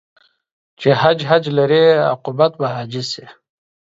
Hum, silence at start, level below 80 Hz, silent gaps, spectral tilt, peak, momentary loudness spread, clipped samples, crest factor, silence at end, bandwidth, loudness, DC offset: none; 0.8 s; -62 dBFS; none; -6 dB/octave; 0 dBFS; 12 LU; under 0.1%; 18 dB; 0.65 s; 7.8 kHz; -16 LUFS; under 0.1%